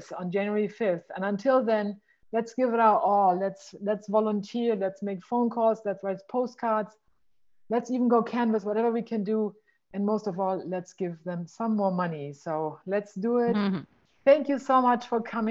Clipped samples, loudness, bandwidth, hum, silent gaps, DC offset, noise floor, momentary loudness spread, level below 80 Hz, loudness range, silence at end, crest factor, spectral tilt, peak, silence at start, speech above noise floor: under 0.1%; -27 LUFS; 7.8 kHz; none; none; under 0.1%; -71 dBFS; 11 LU; -76 dBFS; 4 LU; 0 s; 18 dB; -7.5 dB/octave; -8 dBFS; 0 s; 44 dB